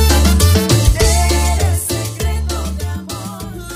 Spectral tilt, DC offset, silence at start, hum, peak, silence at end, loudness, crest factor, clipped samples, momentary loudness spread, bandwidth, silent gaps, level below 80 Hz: -4.5 dB/octave; under 0.1%; 0 s; none; 0 dBFS; 0 s; -15 LUFS; 14 dB; under 0.1%; 14 LU; 16 kHz; none; -18 dBFS